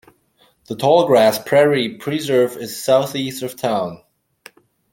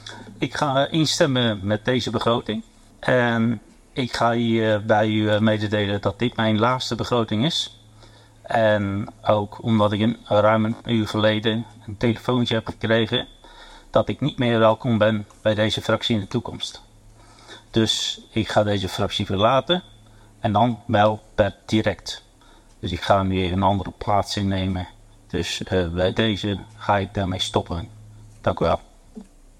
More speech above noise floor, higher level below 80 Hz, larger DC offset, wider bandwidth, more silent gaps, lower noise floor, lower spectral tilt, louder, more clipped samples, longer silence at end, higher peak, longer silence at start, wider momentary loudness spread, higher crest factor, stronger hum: first, 41 dB vs 29 dB; second, -62 dBFS vs -48 dBFS; neither; first, 17 kHz vs 13.5 kHz; neither; first, -58 dBFS vs -51 dBFS; about the same, -5 dB/octave vs -5.5 dB/octave; first, -17 LUFS vs -22 LUFS; neither; first, 0.95 s vs 0.35 s; about the same, -2 dBFS vs -2 dBFS; first, 0.7 s vs 0 s; about the same, 11 LU vs 10 LU; about the same, 16 dB vs 20 dB; neither